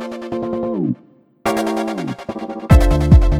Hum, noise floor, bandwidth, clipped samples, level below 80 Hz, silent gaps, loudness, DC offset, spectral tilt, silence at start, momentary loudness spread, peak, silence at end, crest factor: none; -49 dBFS; 15 kHz; under 0.1%; -20 dBFS; none; -18 LUFS; under 0.1%; -7.5 dB/octave; 0 s; 15 LU; 0 dBFS; 0 s; 16 dB